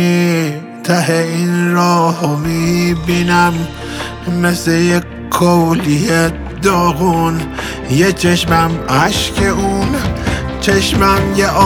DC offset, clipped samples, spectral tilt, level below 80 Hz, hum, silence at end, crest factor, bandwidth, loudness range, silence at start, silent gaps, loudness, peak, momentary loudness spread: under 0.1%; under 0.1%; -5 dB/octave; -30 dBFS; none; 0 s; 12 dB; 17 kHz; 1 LU; 0 s; none; -14 LUFS; 0 dBFS; 8 LU